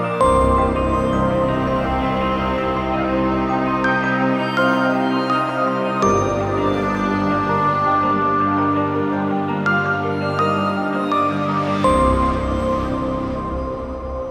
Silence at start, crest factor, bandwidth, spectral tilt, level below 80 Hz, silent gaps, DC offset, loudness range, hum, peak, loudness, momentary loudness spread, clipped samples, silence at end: 0 s; 14 dB; 12.5 kHz; -6.5 dB/octave; -32 dBFS; none; under 0.1%; 1 LU; none; -4 dBFS; -19 LUFS; 4 LU; under 0.1%; 0 s